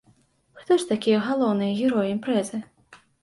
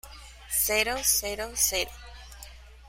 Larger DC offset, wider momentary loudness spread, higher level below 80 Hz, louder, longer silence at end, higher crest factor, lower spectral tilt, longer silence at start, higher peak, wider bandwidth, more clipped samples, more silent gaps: neither; second, 4 LU vs 23 LU; second, -66 dBFS vs -46 dBFS; about the same, -23 LUFS vs -25 LUFS; first, 0.25 s vs 0 s; second, 14 dB vs 22 dB; first, -5.5 dB/octave vs 0 dB/octave; first, 0.55 s vs 0.05 s; about the same, -10 dBFS vs -8 dBFS; second, 11.5 kHz vs 16.5 kHz; neither; neither